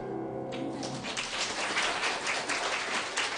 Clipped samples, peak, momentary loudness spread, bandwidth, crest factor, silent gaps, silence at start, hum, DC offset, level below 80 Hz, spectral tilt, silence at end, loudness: under 0.1%; -14 dBFS; 8 LU; 10.5 kHz; 18 dB; none; 0 s; none; under 0.1%; -64 dBFS; -2 dB/octave; 0 s; -31 LUFS